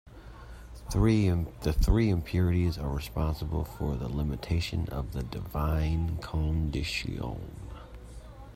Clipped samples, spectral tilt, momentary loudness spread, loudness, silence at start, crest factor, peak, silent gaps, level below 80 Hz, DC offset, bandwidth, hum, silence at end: under 0.1%; -7 dB/octave; 21 LU; -30 LUFS; 0.05 s; 18 dB; -12 dBFS; none; -36 dBFS; under 0.1%; 16 kHz; none; 0 s